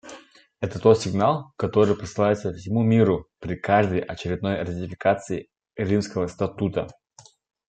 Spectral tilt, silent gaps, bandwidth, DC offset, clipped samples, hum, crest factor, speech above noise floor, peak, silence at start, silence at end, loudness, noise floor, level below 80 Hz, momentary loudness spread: -7 dB/octave; none; 9 kHz; under 0.1%; under 0.1%; none; 20 dB; 31 dB; -2 dBFS; 0.05 s; 0.75 s; -24 LUFS; -54 dBFS; -54 dBFS; 13 LU